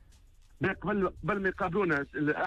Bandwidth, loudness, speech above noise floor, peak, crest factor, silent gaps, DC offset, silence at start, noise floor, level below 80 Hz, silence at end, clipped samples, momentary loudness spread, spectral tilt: 10 kHz; -31 LUFS; 27 dB; -18 dBFS; 14 dB; none; under 0.1%; 0.6 s; -57 dBFS; -52 dBFS; 0 s; under 0.1%; 4 LU; -8 dB/octave